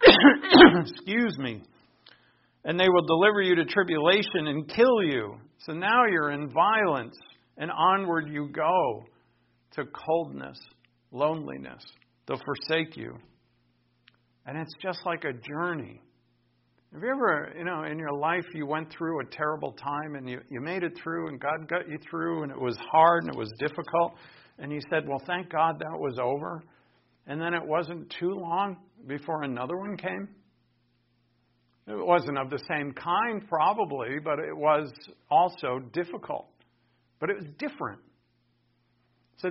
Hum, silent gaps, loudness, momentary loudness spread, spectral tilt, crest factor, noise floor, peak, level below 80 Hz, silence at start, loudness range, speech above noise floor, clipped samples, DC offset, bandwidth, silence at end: none; none; -26 LUFS; 16 LU; -2.5 dB/octave; 26 dB; -70 dBFS; -2 dBFS; -62 dBFS; 0 s; 11 LU; 42 dB; under 0.1%; under 0.1%; 5.8 kHz; 0 s